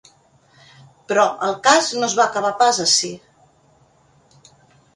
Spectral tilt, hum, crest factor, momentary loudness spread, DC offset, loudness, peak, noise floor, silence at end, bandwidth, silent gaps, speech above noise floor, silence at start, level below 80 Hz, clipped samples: -1 dB/octave; none; 20 dB; 6 LU; under 0.1%; -17 LUFS; 0 dBFS; -56 dBFS; 1.8 s; 11.5 kHz; none; 38 dB; 1.1 s; -66 dBFS; under 0.1%